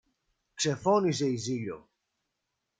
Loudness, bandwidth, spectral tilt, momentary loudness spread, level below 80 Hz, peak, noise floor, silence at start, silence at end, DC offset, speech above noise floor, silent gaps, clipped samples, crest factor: -29 LUFS; 9.6 kHz; -5 dB/octave; 17 LU; -70 dBFS; -12 dBFS; -83 dBFS; 0.55 s; 1 s; under 0.1%; 55 dB; none; under 0.1%; 18 dB